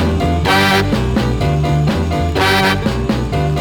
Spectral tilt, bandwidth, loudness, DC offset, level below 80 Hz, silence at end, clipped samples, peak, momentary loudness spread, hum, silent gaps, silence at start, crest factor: -5.5 dB/octave; 19.5 kHz; -14 LUFS; under 0.1%; -26 dBFS; 0 s; under 0.1%; -2 dBFS; 5 LU; none; none; 0 s; 12 dB